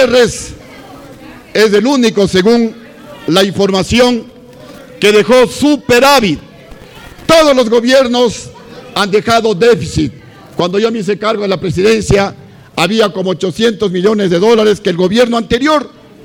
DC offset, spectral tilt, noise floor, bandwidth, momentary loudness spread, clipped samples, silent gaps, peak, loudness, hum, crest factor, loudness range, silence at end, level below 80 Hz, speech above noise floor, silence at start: under 0.1%; -4.5 dB/octave; -34 dBFS; 18.5 kHz; 10 LU; under 0.1%; none; 0 dBFS; -11 LUFS; none; 10 dB; 3 LU; 0.35 s; -36 dBFS; 24 dB; 0 s